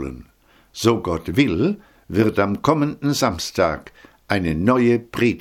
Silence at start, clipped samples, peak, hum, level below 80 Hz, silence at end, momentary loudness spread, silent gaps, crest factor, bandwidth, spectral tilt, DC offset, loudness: 0 s; under 0.1%; 0 dBFS; none; -44 dBFS; 0 s; 11 LU; none; 20 dB; 17 kHz; -5.5 dB/octave; under 0.1%; -20 LUFS